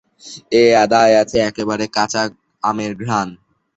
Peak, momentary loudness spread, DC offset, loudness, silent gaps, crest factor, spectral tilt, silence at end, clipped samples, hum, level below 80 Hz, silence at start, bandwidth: -2 dBFS; 12 LU; under 0.1%; -16 LUFS; none; 16 dB; -4.5 dB/octave; 0.4 s; under 0.1%; none; -52 dBFS; 0.25 s; 8.2 kHz